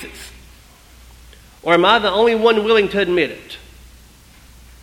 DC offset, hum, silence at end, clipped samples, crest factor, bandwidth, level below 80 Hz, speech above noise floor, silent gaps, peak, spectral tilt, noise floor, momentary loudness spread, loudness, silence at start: under 0.1%; none; 1.25 s; under 0.1%; 18 dB; 16 kHz; -46 dBFS; 30 dB; none; 0 dBFS; -4.5 dB/octave; -45 dBFS; 23 LU; -15 LUFS; 0 s